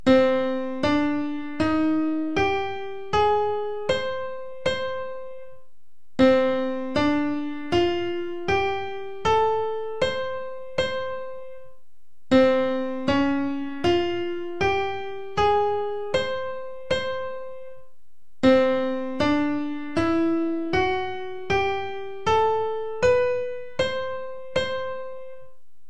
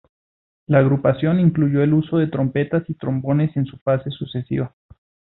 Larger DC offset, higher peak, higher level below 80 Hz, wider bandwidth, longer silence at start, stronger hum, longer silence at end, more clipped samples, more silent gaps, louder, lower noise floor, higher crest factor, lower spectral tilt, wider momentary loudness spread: first, 2% vs under 0.1%; about the same, -6 dBFS vs -4 dBFS; about the same, -50 dBFS vs -52 dBFS; first, 9.4 kHz vs 4.1 kHz; second, 0.05 s vs 0.7 s; neither; second, 0.45 s vs 0.7 s; neither; second, none vs 3.81-3.86 s; second, -24 LUFS vs -20 LUFS; second, -71 dBFS vs under -90 dBFS; about the same, 18 dB vs 16 dB; second, -5.5 dB/octave vs -13 dB/octave; first, 13 LU vs 9 LU